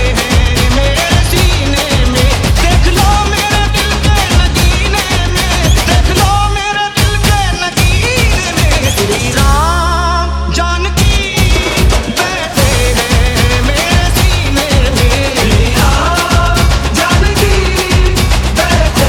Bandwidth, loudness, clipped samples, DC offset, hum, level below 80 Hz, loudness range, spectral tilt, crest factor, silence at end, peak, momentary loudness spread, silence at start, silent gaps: 17.5 kHz; -10 LUFS; under 0.1%; under 0.1%; none; -14 dBFS; 1 LU; -4 dB/octave; 10 dB; 0 s; 0 dBFS; 2 LU; 0 s; none